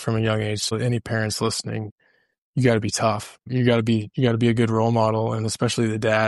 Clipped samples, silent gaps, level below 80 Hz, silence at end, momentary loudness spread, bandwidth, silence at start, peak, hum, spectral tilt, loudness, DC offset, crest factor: under 0.1%; 1.91-1.98 s, 2.38-2.53 s; -54 dBFS; 0 s; 8 LU; 12 kHz; 0 s; -4 dBFS; none; -5.5 dB/octave; -22 LUFS; under 0.1%; 18 dB